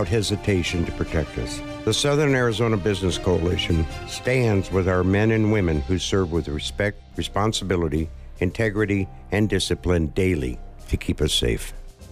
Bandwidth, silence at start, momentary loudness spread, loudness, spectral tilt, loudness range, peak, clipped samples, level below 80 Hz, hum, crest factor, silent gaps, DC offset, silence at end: 15.5 kHz; 0 s; 9 LU; -23 LUFS; -5.5 dB/octave; 3 LU; -10 dBFS; under 0.1%; -34 dBFS; none; 12 dB; none; under 0.1%; 0 s